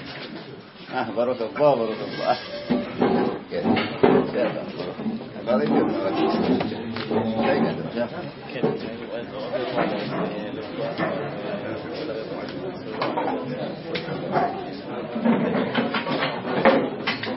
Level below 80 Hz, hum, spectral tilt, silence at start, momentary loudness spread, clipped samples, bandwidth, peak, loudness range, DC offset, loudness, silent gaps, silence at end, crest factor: -58 dBFS; none; -10 dB/octave; 0 s; 11 LU; under 0.1%; 5.8 kHz; -2 dBFS; 6 LU; under 0.1%; -25 LUFS; none; 0 s; 24 dB